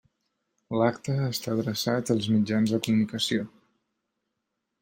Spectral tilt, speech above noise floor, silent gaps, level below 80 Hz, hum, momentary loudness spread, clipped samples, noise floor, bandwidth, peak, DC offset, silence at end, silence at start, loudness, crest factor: -5.5 dB/octave; 56 dB; none; -66 dBFS; none; 5 LU; under 0.1%; -82 dBFS; 16.5 kHz; -10 dBFS; under 0.1%; 1.35 s; 0.7 s; -27 LUFS; 18 dB